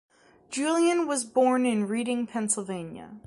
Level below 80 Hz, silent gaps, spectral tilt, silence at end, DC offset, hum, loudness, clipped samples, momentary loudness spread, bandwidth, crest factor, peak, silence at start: -70 dBFS; none; -4 dB/octave; 0.05 s; under 0.1%; none; -26 LUFS; under 0.1%; 13 LU; 11.5 kHz; 16 dB; -10 dBFS; 0.5 s